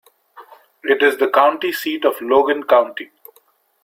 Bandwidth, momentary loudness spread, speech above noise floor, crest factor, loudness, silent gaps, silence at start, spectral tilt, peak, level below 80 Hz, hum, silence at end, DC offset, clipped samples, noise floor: 16.5 kHz; 13 LU; 41 dB; 18 dB; -16 LUFS; none; 0.35 s; -3 dB/octave; -2 dBFS; -64 dBFS; none; 0.8 s; under 0.1%; under 0.1%; -57 dBFS